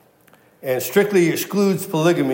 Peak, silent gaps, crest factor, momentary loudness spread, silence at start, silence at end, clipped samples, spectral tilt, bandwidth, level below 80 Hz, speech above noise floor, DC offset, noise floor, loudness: -4 dBFS; none; 16 dB; 7 LU; 0.65 s; 0 s; under 0.1%; -5.5 dB/octave; 16.5 kHz; -74 dBFS; 35 dB; under 0.1%; -53 dBFS; -19 LUFS